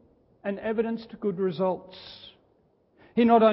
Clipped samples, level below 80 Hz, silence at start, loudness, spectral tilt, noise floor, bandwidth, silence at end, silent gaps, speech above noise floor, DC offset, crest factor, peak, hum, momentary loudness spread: under 0.1%; -66 dBFS; 0.45 s; -27 LUFS; -10.5 dB/octave; -65 dBFS; 5.8 kHz; 0 s; none; 41 dB; under 0.1%; 20 dB; -8 dBFS; none; 22 LU